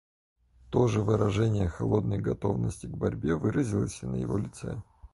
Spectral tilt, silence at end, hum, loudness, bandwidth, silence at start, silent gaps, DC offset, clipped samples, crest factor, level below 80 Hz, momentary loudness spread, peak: -7.5 dB/octave; 0.05 s; none; -29 LUFS; 11.5 kHz; 0.65 s; none; under 0.1%; under 0.1%; 18 dB; -46 dBFS; 8 LU; -12 dBFS